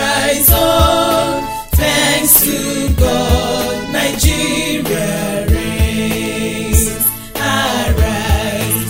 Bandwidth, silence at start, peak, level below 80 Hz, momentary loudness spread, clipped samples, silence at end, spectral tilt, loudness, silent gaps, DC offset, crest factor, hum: 16.5 kHz; 0 s; 0 dBFS; -20 dBFS; 8 LU; under 0.1%; 0 s; -3.5 dB/octave; -13 LUFS; none; under 0.1%; 14 dB; none